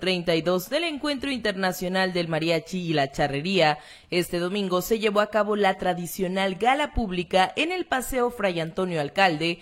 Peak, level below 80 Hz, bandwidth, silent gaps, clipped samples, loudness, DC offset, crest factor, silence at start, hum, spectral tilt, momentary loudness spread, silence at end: -6 dBFS; -46 dBFS; 16.5 kHz; none; under 0.1%; -25 LUFS; under 0.1%; 18 dB; 0 s; none; -4.5 dB/octave; 6 LU; 0 s